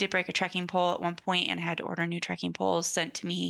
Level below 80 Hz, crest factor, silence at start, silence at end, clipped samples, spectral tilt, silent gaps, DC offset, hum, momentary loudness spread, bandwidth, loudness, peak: -76 dBFS; 16 dB; 0 s; 0 s; under 0.1%; -3.5 dB/octave; none; under 0.1%; none; 4 LU; 12.5 kHz; -30 LUFS; -14 dBFS